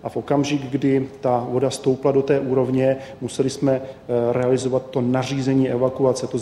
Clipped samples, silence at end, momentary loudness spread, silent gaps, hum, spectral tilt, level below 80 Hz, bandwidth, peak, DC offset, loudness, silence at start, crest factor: under 0.1%; 0 s; 4 LU; none; none; -6.5 dB/octave; -56 dBFS; 12 kHz; -6 dBFS; under 0.1%; -21 LUFS; 0.05 s; 14 dB